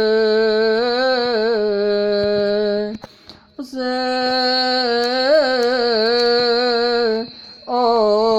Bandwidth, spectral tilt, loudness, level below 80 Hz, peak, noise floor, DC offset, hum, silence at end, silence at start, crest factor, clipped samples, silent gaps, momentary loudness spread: 10 kHz; -4.5 dB/octave; -17 LUFS; -54 dBFS; -4 dBFS; -45 dBFS; under 0.1%; none; 0 s; 0 s; 12 dB; under 0.1%; none; 9 LU